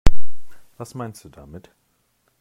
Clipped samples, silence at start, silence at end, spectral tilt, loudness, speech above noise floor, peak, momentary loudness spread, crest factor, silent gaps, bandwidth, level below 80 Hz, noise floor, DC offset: 0.5%; 0.05 s; 0 s; -6 dB/octave; -34 LUFS; 41 dB; 0 dBFS; 24 LU; 16 dB; none; 11 kHz; -28 dBFS; -66 dBFS; under 0.1%